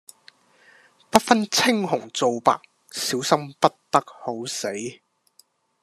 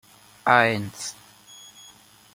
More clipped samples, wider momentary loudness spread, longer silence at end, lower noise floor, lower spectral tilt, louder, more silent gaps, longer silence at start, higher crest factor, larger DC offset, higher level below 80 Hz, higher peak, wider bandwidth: neither; second, 12 LU vs 26 LU; second, 0.9 s vs 1.2 s; first, -60 dBFS vs -52 dBFS; about the same, -3 dB/octave vs -4 dB/octave; about the same, -22 LUFS vs -22 LUFS; neither; first, 1.15 s vs 0.45 s; about the same, 24 dB vs 24 dB; neither; about the same, -64 dBFS vs -66 dBFS; about the same, 0 dBFS vs -2 dBFS; second, 14 kHz vs 16.5 kHz